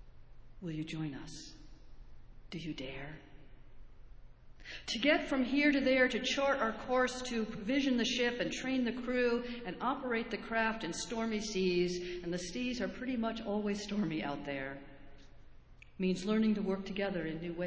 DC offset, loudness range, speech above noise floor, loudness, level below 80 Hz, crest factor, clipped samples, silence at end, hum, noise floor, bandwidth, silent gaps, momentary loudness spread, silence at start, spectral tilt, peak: under 0.1%; 13 LU; 21 dB; -34 LUFS; -58 dBFS; 20 dB; under 0.1%; 0 s; none; -55 dBFS; 8 kHz; none; 14 LU; 0 s; -4.5 dB/octave; -14 dBFS